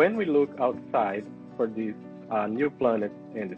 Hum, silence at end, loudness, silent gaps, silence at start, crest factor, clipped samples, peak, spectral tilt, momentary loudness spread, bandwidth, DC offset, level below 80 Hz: none; 0 s; -28 LUFS; none; 0 s; 18 dB; under 0.1%; -8 dBFS; -8.5 dB/octave; 11 LU; 5.8 kHz; under 0.1%; -70 dBFS